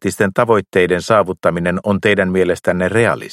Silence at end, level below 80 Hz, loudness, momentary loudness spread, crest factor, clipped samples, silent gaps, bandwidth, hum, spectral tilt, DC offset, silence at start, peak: 0 s; -48 dBFS; -15 LUFS; 3 LU; 14 dB; under 0.1%; none; 15 kHz; none; -6 dB/octave; under 0.1%; 0 s; 0 dBFS